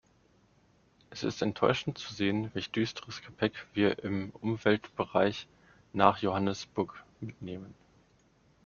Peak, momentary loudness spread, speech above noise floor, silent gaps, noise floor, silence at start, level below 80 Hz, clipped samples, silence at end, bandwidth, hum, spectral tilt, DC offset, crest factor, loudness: -6 dBFS; 16 LU; 35 dB; none; -66 dBFS; 1.1 s; -66 dBFS; under 0.1%; 0.95 s; 7.2 kHz; none; -4.5 dB/octave; under 0.1%; 26 dB; -31 LUFS